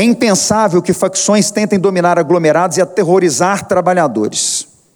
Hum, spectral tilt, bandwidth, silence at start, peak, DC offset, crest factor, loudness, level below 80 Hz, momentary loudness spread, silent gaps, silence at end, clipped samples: none; -4 dB/octave; over 20 kHz; 0 s; 0 dBFS; under 0.1%; 12 dB; -12 LUFS; -52 dBFS; 4 LU; none; 0.35 s; under 0.1%